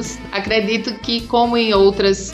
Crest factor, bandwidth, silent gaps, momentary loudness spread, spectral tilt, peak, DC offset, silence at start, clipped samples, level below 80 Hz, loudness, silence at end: 14 dB; 11 kHz; none; 8 LU; -4 dB/octave; -4 dBFS; under 0.1%; 0 s; under 0.1%; -38 dBFS; -17 LUFS; 0 s